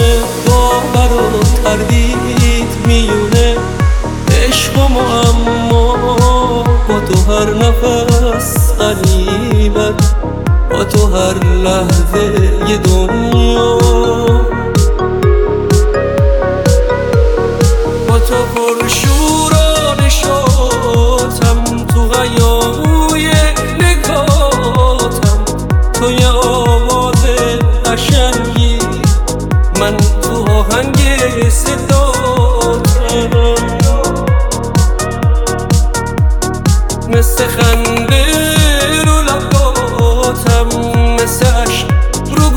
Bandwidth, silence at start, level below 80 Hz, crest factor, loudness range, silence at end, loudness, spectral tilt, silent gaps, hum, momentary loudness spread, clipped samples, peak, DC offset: 19 kHz; 0 s; -14 dBFS; 10 dB; 1 LU; 0 s; -11 LUFS; -5 dB/octave; none; none; 3 LU; under 0.1%; 0 dBFS; under 0.1%